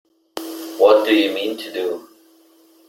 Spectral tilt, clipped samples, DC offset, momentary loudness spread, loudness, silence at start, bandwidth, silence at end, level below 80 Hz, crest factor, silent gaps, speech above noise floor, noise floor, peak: -3 dB/octave; under 0.1%; under 0.1%; 18 LU; -17 LUFS; 0.35 s; 17 kHz; 0.85 s; -68 dBFS; 18 dB; none; 36 dB; -53 dBFS; -2 dBFS